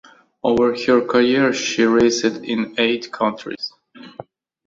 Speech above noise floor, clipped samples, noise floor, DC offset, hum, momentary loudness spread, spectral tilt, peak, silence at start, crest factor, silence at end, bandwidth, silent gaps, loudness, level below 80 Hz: 23 dB; under 0.1%; -40 dBFS; under 0.1%; none; 14 LU; -4 dB/octave; -2 dBFS; 0.45 s; 16 dB; 0.45 s; 7.8 kHz; none; -18 LUFS; -54 dBFS